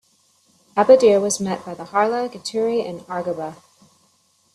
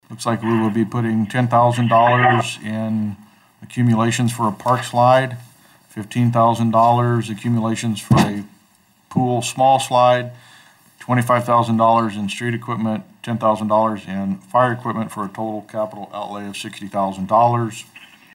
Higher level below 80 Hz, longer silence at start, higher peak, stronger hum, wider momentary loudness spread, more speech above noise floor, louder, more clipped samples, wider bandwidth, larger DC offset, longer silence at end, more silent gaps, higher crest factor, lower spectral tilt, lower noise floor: second, -66 dBFS vs -54 dBFS; first, 0.75 s vs 0.1 s; first, 0 dBFS vs -4 dBFS; neither; about the same, 15 LU vs 13 LU; first, 43 dB vs 38 dB; about the same, -19 LUFS vs -18 LUFS; neither; second, 13 kHz vs 15.5 kHz; neither; first, 1 s vs 0.3 s; neither; first, 20 dB vs 14 dB; second, -4 dB/octave vs -6 dB/octave; first, -61 dBFS vs -56 dBFS